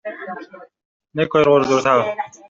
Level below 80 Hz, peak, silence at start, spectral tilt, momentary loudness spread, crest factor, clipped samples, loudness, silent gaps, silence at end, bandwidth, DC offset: -60 dBFS; -2 dBFS; 0.05 s; -5.5 dB/octave; 18 LU; 16 dB; under 0.1%; -16 LUFS; 0.85-1.00 s; 0.2 s; 7.6 kHz; under 0.1%